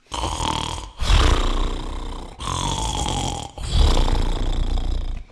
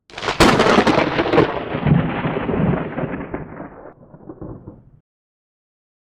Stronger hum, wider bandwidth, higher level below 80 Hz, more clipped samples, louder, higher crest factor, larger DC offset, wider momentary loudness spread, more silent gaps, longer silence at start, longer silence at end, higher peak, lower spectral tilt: neither; second, 12 kHz vs 16 kHz; first, -22 dBFS vs -38 dBFS; neither; second, -24 LUFS vs -17 LUFS; about the same, 16 dB vs 18 dB; neither; second, 12 LU vs 22 LU; neither; about the same, 0.1 s vs 0.15 s; second, 0.05 s vs 1.25 s; about the same, -4 dBFS vs -2 dBFS; second, -4 dB/octave vs -5.5 dB/octave